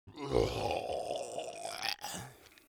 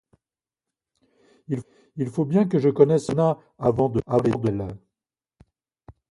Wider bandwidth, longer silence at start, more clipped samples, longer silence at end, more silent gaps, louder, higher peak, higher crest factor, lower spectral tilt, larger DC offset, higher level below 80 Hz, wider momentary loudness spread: first, over 20 kHz vs 11.5 kHz; second, 0.05 s vs 1.5 s; neither; about the same, 0.2 s vs 0.2 s; neither; second, -37 LUFS vs -23 LUFS; second, -14 dBFS vs -2 dBFS; about the same, 24 dB vs 22 dB; second, -4 dB/octave vs -8.5 dB/octave; neither; about the same, -52 dBFS vs -54 dBFS; second, 10 LU vs 13 LU